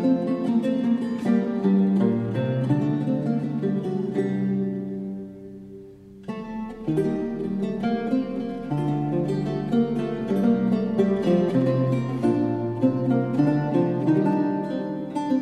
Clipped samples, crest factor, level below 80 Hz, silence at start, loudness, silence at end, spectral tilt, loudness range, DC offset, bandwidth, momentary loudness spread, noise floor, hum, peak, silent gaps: under 0.1%; 16 dB; -54 dBFS; 0 s; -24 LUFS; 0 s; -9.5 dB/octave; 7 LU; under 0.1%; 9.4 kHz; 10 LU; -44 dBFS; none; -8 dBFS; none